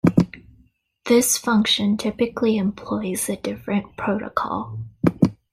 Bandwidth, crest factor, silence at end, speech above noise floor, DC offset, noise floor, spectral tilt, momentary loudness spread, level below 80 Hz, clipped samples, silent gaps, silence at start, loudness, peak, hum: 16 kHz; 20 dB; 0.2 s; 37 dB; under 0.1%; -58 dBFS; -4.5 dB/octave; 9 LU; -52 dBFS; under 0.1%; none; 0.05 s; -22 LUFS; -2 dBFS; none